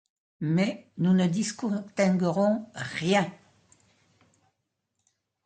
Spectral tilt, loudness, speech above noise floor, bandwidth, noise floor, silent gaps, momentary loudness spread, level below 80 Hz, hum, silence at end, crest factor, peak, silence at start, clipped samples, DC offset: -6 dB/octave; -27 LUFS; 54 dB; 9.2 kHz; -80 dBFS; none; 8 LU; -70 dBFS; none; 2.1 s; 18 dB; -10 dBFS; 0.4 s; under 0.1%; under 0.1%